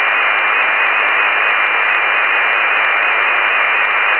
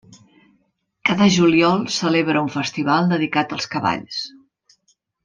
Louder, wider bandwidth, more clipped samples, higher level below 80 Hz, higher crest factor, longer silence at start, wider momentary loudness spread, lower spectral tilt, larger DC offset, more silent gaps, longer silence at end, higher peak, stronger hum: first, -12 LUFS vs -19 LUFS; second, 5 kHz vs 9.6 kHz; neither; second, -78 dBFS vs -60 dBFS; second, 12 dB vs 18 dB; second, 0 s vs 1.05 s; second, 0 LU vs 10 LU; second, -3 dB/octave vs -5 dB/octave; first, 0.3% vs under 0.1%; neither; second, 0 s vs 0.95 s; about the same, -2 dBFS vs -4 dBFS; neither